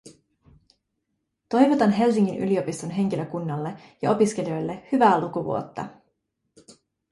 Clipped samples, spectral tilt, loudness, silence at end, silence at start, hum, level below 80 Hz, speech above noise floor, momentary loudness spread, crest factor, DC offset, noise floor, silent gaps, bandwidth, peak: under 0.1%; -6.5 dB/octave; -23 LUFS; 0.4 s; 0.05 s; none; -64 dBFS; 55 dB; 12 LU; 18 dB; under 0.1%; -78 dBFS; none; 11.5 kHz; -6 dBFS